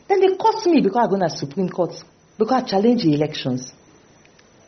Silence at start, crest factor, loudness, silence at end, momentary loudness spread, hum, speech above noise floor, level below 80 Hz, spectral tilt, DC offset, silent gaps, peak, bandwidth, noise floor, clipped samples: 0.1 s; 16 dB; -20 LUFS; 0.95 s; 9 LU; none; 33 dB; -62 dBFS; -5.5 dB/octave; under 0.1%; none; -4 dBFS; 6.4 kHz; -52 dBFS; under 0.1%